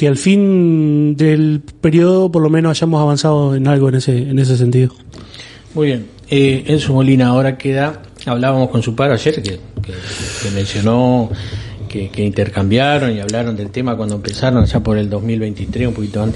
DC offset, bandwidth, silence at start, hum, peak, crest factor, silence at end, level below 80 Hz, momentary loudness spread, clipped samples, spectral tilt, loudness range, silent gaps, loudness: under 0.1%; 11.5 kHz; 0 s; none; 0 dBFS; 14 dB; 0 s; -36 dBFS; 12 LU; under 0.1%; -7 dB/octave; 5 LU; none; -14 LUFS